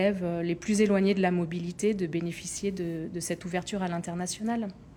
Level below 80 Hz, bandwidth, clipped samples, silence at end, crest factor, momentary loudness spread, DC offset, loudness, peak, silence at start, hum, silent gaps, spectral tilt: -58 dBFS; 17.5 kHz; under 0.1%; 0 s; 16 dB; 9 LU; under 0.1%; -29 LUFS; -12 dBFS; 0 s; none; none; -5.5 dB/octave